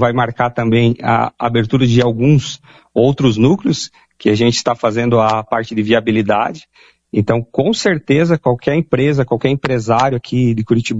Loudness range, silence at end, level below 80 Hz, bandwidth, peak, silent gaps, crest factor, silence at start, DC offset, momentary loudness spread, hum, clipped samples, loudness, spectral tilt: 2 LU; 0 s; -42 dBFS; 8 kHz; 0 dBFS; none; 14 dB; 0 s; under 0.1%; 6 LU; none; under 0.1%; -15 LUFS; -6.5 dB/octave